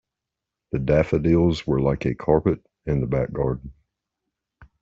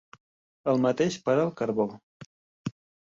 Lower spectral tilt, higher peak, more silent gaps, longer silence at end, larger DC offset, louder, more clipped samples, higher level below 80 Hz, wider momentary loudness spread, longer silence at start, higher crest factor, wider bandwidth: first, -8.5 dB/octave vs -6.5 dB/octave; first, -6 dBFS vs -12 dBFS; second, none vs 2.03-2.20 s, 2.26-2.65 s; second, 0.2 s vs 0.4 s; neither; first, -23 LUFS vs -27 LUFS; neither; first, -40 dBFS vs -68 dBFS; second, 8 LU vs 14 LU; about the same, 0.75 s vs 0.65 s; about the same, 18 dB vs 18 dB; about the same, 7.6 kHz vs 7.8 kHz